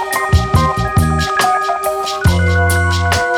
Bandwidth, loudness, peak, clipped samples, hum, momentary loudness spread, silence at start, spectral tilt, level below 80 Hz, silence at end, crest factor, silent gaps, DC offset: 17 kHz; -14 LUFS; 0 dBFS; under 0.1%; none; 3 LU; 0 s; -5 dB/octave; -24 dBFS; 0 s; 14 dB; none; under 0.1%